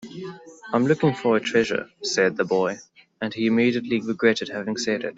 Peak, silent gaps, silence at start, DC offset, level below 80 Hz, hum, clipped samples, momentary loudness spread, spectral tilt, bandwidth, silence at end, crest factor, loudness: -6 dBFS; none; 0 s; under 0.1%; -66 dBFS; none; under 0.1%; 14 LU; -5 dB/octave; 8 kHz; 0.05 s; 18 dB; -23 LUFS